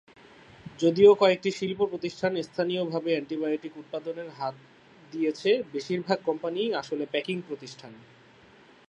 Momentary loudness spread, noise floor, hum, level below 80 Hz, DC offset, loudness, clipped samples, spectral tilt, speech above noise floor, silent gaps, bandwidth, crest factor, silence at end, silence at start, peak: 17 LU; -55 dBFS; none; -70 dBFS; under 0.1%; -27 LUFS; under 0.1%; -5.5 dB/octave; 28 dB; none; 8.4 kHz; 20 dB; 0.9 s; 0.65 s; -6 dBFS